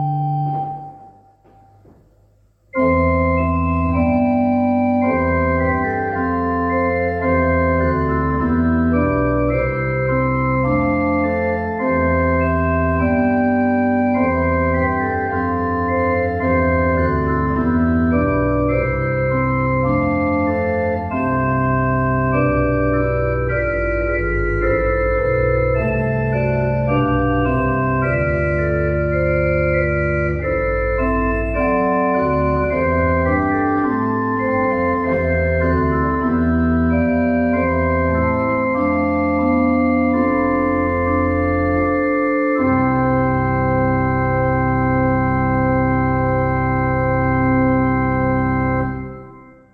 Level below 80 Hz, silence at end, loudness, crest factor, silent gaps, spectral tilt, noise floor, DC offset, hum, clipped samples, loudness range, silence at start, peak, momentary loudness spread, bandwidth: -30 dBFS; 0.3 s; -18 LUFS; 12 dB; none; -11 dB/octave; -55 dBFS; under 0.1%; none; under 0.1%; 1 LU; 0 s; -4 dBFS; 3 LU; 5 kHz